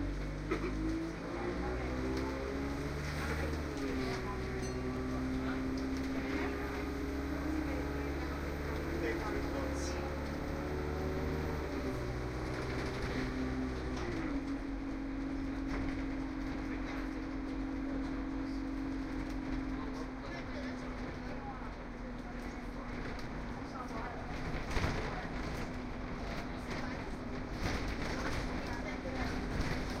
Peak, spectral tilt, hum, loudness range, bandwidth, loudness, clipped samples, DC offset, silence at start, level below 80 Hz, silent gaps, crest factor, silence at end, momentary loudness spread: -18 dBFS; -6 dB/octave; none; 4 LU; 15.5 kHz; -39 LUFS; under 0.1%; under 0.1%; 0 s; -44 dBFS; none; 18 dB; 0 s; 6 LU